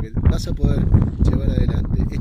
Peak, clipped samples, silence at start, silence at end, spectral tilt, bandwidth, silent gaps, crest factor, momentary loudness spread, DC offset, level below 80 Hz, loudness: -4 dBFS; under 0.1%; 0 s; 0 s; -8.5 dB/octave; 9.8 kHz; none; 14 dB; 4 LU; under 0.1%; -20 dBFS; -20 LUFS